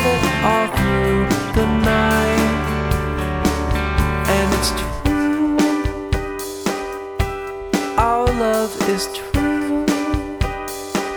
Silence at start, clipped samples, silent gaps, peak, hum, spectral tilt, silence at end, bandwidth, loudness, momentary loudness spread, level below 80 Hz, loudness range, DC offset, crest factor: 0 s; under 0.1%; none; -2 dBFS; none; -5.5 dB/octave; 0 s; over 20 kHz; -19 LUFS; 7 LU; -28 dBFS; 3 LU; under 0.1%; 16 dB